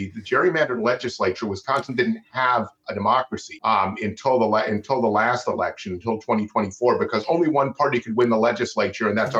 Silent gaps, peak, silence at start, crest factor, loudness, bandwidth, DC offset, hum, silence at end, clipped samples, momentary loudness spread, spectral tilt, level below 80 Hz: none; -8 dBFS; 0 s; 14 dB; -22 LUFS; 8.6 kHz; under 0.1%; none; 0 s; under 0.1%; 6 LU; -5.5 dB/octave; -64 dBFS